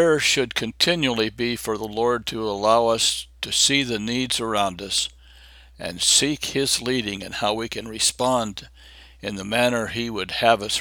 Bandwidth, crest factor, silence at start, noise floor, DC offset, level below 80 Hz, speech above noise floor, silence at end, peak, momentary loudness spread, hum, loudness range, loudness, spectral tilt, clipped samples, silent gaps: over 20 kHz; 20 dB; 0 s; -48 dBFS; under 0.1%; -50 dBFS; 25 dB; 0 s; -2 dBFS; 11 LU; none; 3 LU; -21 LUFS; -2.5 dB/octave; under 0.1%; none